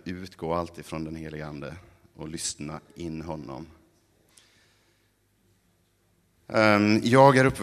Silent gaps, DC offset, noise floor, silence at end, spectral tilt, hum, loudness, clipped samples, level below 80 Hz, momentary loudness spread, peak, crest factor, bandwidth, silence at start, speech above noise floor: none; under 0.1%; -68 dBFS; 0 s; -5.5 dB/octave; none; -24 LUFS; under 0.1%; -56 dBFS; 22 LU; -4 dBFS; 24 dB; 13.5 kHz; 0.05 s; 43 dB